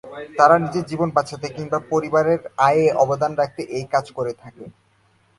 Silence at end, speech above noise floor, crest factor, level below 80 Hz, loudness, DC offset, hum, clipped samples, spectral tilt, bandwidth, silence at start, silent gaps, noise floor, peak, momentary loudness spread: 0.7 s; 40 dB; 20 dB; -58 dBFS; -20 LUFS; under 0.1%; none; under 0.1%; -6 dB/octave; 11.5 kHz; 0.05 s; none; -60 dBFS; 0 dBFS; 14 LU